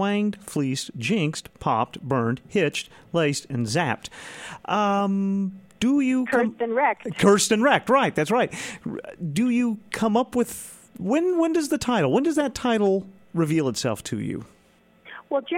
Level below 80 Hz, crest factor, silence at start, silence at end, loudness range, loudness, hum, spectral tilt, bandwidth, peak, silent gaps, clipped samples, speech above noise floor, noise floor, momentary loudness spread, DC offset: -58 dBFS; 18 dB; 0 s; 0 s; 4 LU; -24 LUFS; none; -5 dB/octave; 16.5 kHz; -4 dBFS; none; under 0.1%; 35 dB; -58 dBFS; 12 LU; under 0.1%